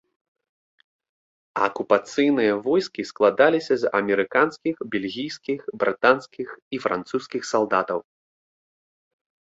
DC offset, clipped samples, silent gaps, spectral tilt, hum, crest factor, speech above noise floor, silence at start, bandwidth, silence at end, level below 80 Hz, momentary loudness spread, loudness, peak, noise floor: under 0.1%; under 0.1%; 6.62-6.71 s; -5 dB/octave; none; 22 dB; over 68 dB; 1.55 s; 8 kHz; 1.45 s; -68 dBFS; 11 LU; -23 LUFS; -2 dBFS; under -90 dBFS